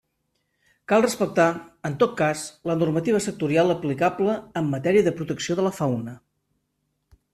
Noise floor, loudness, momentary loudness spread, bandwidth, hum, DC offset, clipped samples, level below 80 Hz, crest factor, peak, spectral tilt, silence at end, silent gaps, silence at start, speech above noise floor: -75 dBFS; -23 LUFS; 8 LU; 14 kHz; none; under 0.1%; under 0.1%; -60 dBFS; 18 dB; -6 dBFS; -5.5 dB/octave; 1.15 s; none; 0.9 s; 52 dB